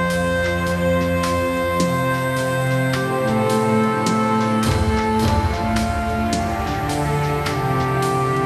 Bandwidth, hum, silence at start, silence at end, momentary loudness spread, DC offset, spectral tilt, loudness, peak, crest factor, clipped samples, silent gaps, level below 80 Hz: 15 kHz; none; 0 s; 0 s; 3 LU; under 0.1%; -6 dB/octave; -20 LUFS; -6 dBFS; 14 dB; under 0.1%; none; -32 dBFS